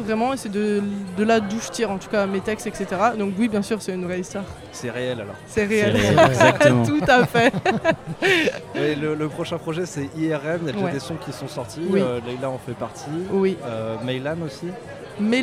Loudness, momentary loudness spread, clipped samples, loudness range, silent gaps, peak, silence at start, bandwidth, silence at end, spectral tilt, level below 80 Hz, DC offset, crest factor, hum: -22 LUFS; 14 LU; under 0.1%; 8 LU; none; -4 dBFS; 0 s; 16 kHz; 0 s; -5.5 dB/octave; -50 dBFS; under 0.1%; 18 dB; none